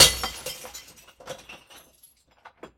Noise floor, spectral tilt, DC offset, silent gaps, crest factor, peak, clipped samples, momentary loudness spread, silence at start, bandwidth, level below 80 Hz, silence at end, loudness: -59 dBFS; 0 dB/octave; under 0.1%; none; 28 dB; 0 dBFS; under 0.1%; 20 LU; 0 s; 16.5 kHz; -48 dBFS; 1.2 s; -24 LUFS